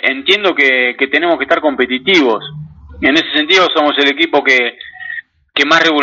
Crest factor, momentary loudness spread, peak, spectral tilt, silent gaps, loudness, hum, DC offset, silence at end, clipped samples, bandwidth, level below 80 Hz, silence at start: 12 dB; 15 LU; 0 dBFS; -3.5 dB/octave; none; -11 LUFS; none; under 0.1%; 0 s; under 0.1%; 7.6 kHz; -48 dBFS; 0.05 s